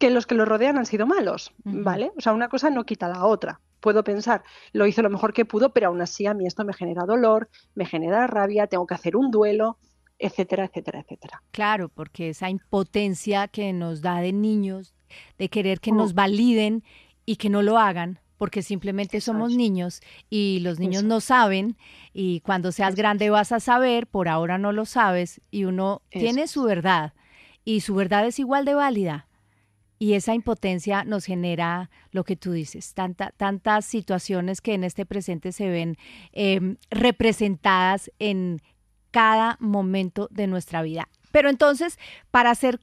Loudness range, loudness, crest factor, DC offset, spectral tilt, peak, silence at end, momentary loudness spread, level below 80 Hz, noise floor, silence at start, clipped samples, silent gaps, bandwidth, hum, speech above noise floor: 5 LU; -23 LUFS; 20 dB; under 0.1%; -5.5 dB/octave; -4 dBFS; 0.05 s; 11 LU; -56 dBFS; -64 dBFS; 0 s; under 0.1%; none; 13.5 kHz; none; 42 dB